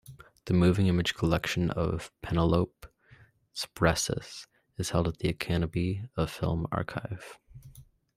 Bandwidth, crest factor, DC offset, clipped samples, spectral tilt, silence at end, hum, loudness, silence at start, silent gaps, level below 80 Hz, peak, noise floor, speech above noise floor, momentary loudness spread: 15.5 kHz; 20 dB; under 0.1%; under 0.1%; -5.5 dB/octave; 0.35 s; none; -29 LUFS; 0.1 s; none; -48 dBFS; -10 dBFS; -59 dBFS; 30 dB; 16 LU